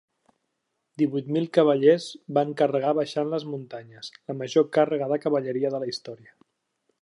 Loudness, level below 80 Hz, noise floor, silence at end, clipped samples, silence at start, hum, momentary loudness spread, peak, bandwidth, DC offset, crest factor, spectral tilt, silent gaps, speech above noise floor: -24 LUFS; -80 dBFS; -78 dBFS; 0.85 s; under 0.1%; 1 s; none; 15 LU; -6 dBFS; 11 kHz; under 0.1%; 20 dB; -6.5 dB/octave; none; 54 dB